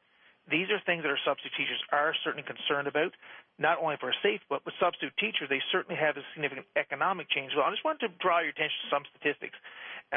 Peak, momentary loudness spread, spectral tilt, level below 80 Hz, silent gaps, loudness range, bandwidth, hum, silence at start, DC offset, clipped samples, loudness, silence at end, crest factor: -14 dBFS; 7 LU; -7.5 dB/octave; -78 dBFS; none; 1 LU; 4.1 kHz; none; 0.5 s; under 0.1%; under 0.1%; -30 LUFS; 0 s; 18 dB